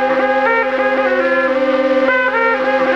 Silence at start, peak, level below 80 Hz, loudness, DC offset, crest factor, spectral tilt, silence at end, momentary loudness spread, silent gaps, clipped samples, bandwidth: 0 s; -4 dBFS; -52 dBFS; -14 LUFS; under 0.1%; 10 dB; -4.5 dB/octave; 0 s; 1 LU; none; under 0.1%; 7 kHz